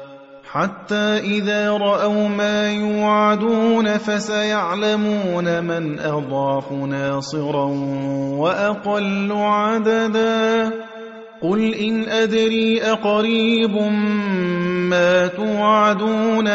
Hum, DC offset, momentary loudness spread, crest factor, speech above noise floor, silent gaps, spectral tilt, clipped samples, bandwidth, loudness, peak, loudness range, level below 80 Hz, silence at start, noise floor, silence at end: none; under 0.1%; 7 LU; 14 dB; 21 dB; none; -5.5 dB/octave; under 0.1%; 8 kHz; -19 LUFS; -4 dBFS; 4 LU; -60 dBFS; 0 s; -39 dBFS; 0 s